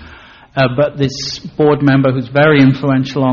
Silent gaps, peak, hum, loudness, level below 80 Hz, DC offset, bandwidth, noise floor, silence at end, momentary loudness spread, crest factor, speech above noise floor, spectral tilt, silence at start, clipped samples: none; 0 dBFS; none; -13 LUFS; -44 dBFS; under 0.1%; 7.2 kHz; -38 dBFS; 0 s; 10 LU; 12 dB; 26 dB; -5.5 dB/octave; 0 s; under 0.1%